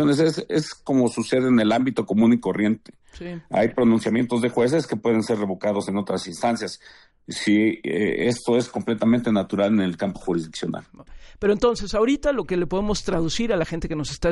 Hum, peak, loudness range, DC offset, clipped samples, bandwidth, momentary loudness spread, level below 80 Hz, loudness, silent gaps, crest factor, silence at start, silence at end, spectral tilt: none; -6 dBFS; 3 LU; under 0.1%; under 0.1%; 11.5 kHz; 9 LU; -44 dBFS; -22 LUFS; none; 16 dB; 0 s; 0 s; -6 dB/octave